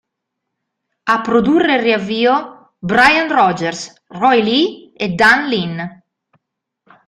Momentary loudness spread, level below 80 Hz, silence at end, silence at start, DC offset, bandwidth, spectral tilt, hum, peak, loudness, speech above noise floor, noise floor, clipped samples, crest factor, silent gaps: 16 LU; -52 dBFS; 1.15 s; 1.05 s; under 0.1%; 15 kHz; -5 dB/octave; none; 0 dBFS; -14 LUFS; 63 dB; -77 dBFS; under 0.1%; 16 dB; none